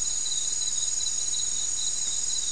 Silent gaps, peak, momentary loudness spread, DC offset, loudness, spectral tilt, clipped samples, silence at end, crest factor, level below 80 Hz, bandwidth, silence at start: none; -16 dBFS; 1 LU; 2%; -25 LUFS; 2 dB/octave; under 0.1%; 0 s; 12 dB; -54 dBFS; 12 kHz; 0 s